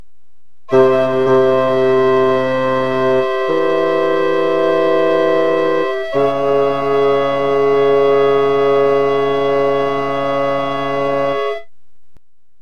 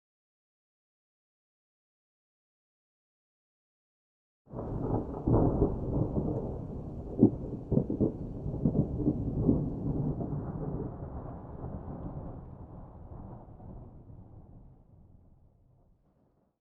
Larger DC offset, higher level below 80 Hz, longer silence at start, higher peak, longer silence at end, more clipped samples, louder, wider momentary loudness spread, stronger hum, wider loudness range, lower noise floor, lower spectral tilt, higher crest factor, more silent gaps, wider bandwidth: first, 4% vs under 0.1%; second, -50 dBFS vs -44 dBFS; second, 0.7 s vs 4.5 s; first, 0 dBFS vs -8 dBFS; second, 0 s vs 1.6 s; neither; first, -15 LUFS vs -33 LUFS; second, 5 LU vs 21 LU; neither; second, 2 LU vs 19 LU; second, -66 dBFS vs -70 dBFS; second, -6.5 dB/octave vs -13.5 dB/octave; second, 14 dB vs 26 dB; neither; first, 7 kHz vs 1.9 kHz